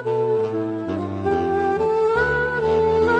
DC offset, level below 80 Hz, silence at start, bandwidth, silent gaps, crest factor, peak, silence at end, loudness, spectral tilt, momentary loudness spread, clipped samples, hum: under 0.1%; -42 dBFS; 0 s; 8.4 kHz; none; 12 dB; -8 dBFS; 0 s; -21 LUFS; -7.5 dB/octave; 7 LU; under 0.1%; none